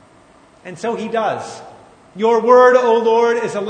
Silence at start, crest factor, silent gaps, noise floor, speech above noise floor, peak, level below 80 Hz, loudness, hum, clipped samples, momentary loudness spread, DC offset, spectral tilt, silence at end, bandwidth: 0.65 s; 16 dB; none; -48 dBFS; 33 dB; 0 dBFS; -64 dBFS; -14 LUFS; none; under 0.1%; 20 LU; under 0.1%; -4.5 dB/octave; 0 s; 9.4 kHz